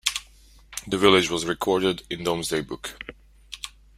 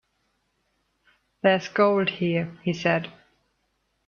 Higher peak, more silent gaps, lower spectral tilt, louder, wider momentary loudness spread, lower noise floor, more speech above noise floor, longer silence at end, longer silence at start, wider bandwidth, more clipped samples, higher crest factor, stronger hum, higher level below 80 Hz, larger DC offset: first, -2 dBFS vs -6 dBFS; neither; second, -3.5 dB/octave vs -6.5 dB/octave; about the same, -23 LUFS vs -24 LUFS; first, 19 LU vs 7 LU; second, -52 dBFS vs -73 dBFS; second, 29 dB vs 50 dB; second, 0.3 s vs 0.95 s; second, 0.05 s vs 1.45 s; first, 16 kHz vs 7 kHz; neither; about the same, 24 dB vs 22 dB; neither; first, -52 dBFS vs -68 dBFS; neither